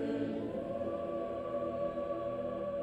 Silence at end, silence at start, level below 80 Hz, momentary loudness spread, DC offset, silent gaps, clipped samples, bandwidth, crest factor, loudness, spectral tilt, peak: 0 s; 0 s; -62 dBFS; 2 LU; under 0.1%; none; under 0.1%; 8.6 kHz; 14 dB; -38 LUFS; -8.5 dB/octave; -24 dBFS